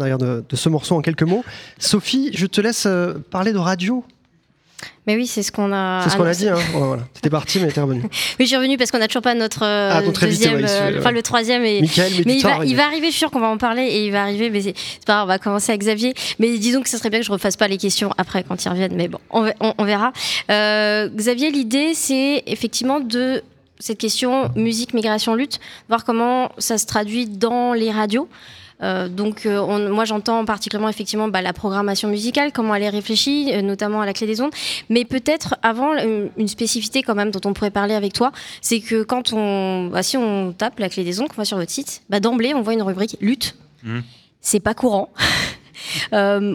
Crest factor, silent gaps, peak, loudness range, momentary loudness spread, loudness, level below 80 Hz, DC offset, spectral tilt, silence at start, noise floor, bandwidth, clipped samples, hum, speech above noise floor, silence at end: 18 dB; none; 0 dBFS; 4 LU; 7 LU; -19 LUFS; -54 dBFS; under 0.1%; -4 dB/octave; 0 s; -59 dBFS; 19 kHz; under 0.1%; none; 40 dB; 0 s